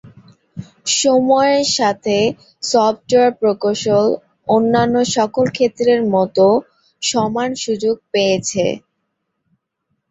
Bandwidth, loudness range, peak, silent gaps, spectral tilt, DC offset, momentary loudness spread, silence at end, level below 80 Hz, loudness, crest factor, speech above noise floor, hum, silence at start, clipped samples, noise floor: 8.2 kHz; 3 LU; -2 dBFS; none; -4 dB/octave; under 0.1%; 8 LU; 1.3 s; -56 dBFS; -16 LUFS; 16 dB; 57 dB; none; 0.05 s; under 0.1%; -72 dBFS